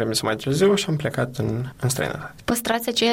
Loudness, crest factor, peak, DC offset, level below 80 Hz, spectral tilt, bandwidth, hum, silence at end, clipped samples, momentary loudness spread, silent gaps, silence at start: -23 LUFS; 14 dB; -8 dBFS; under 0.1%; -50 dBFS; -4.5 dB/octave; 16.5 kHz; none; 0 s; under 0.1%; 8 LU; none; 0 s